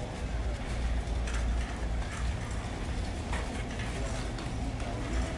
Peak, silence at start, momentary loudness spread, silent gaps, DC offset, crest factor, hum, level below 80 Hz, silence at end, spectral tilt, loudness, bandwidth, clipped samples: -22 dBFS; 0 s; 3 LU; none; under 0.1%; 12 dB; none; -34 dBFS; 0 s; -5.5 dB/octave; -35 LUFS; 11.5 kHz; under 0.1%